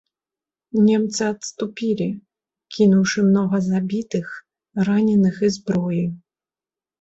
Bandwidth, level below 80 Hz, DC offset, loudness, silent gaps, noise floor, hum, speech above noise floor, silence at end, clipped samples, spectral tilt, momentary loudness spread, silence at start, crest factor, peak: 8 kHz; -60 dBFS; under 0.1%; -20 LUFS; none; under -90 dBFS; none; over 71 dB; 0.85 s; under 0.1%; -6.5 dB/octave; 13 LU; 0.75 s; 16 dB; -6 dBFS